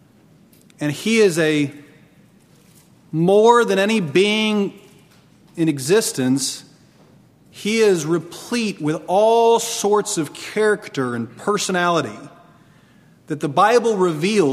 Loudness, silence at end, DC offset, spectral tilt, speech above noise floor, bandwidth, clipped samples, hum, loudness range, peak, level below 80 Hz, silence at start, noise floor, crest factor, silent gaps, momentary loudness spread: -18 LUFS; 0 s; under 0.1%; -4.5 dB/octave; 34 dB; 15.5 kHz; under 0.1%; none; 4 LU; 0 dBFS; -66 dBFS; 0.8 s; -51 dBFS; 18 dB; none; 12 LU